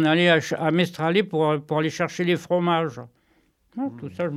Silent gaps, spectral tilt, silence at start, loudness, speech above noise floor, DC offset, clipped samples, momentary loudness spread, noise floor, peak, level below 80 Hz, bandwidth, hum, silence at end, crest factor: none; -6 dB/octave; 0 s; -23 LUFS; 42 dB; under 0.1%; under 0.1%; 12 LU; -64 dBFS; -4 dBFS; -68 dBFS; 13 kHz; none; 0 s; 18 dB